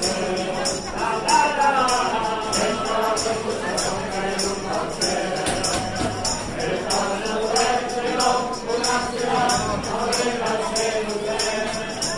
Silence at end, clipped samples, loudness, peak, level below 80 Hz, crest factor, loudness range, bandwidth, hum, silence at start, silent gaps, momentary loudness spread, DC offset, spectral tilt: 0 s; under 0.1%; -22 LUFS; -6 dBFS; -42 dBFS; 16 dB; 3 LU; 12 kHz; none; 0 s; none; 6 LU; under 0.1%; -2.5 dB/octave